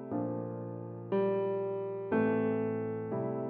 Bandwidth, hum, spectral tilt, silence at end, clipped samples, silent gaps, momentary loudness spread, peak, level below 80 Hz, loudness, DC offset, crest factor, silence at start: 4.3 kHz; none; -8 dB/octave; 0 s; under 0.1%; none; 10 LU; -18 dBFS; -76 dBFS; -34 LUFS; under 0.1%; 16 dB; 0 s